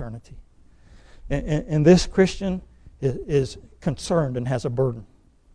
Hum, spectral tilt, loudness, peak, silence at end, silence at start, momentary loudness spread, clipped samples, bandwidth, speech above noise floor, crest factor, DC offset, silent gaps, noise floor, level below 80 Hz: none; -6.5 dB/octave; -23 LUFS; -4 dBFS; 0.5 s; 0 s; 15 LU; under 0.1%; 10.5 kHz; 28 dB; 20 dB; under 0.1%; none; -50 dBFS; -40 dBFS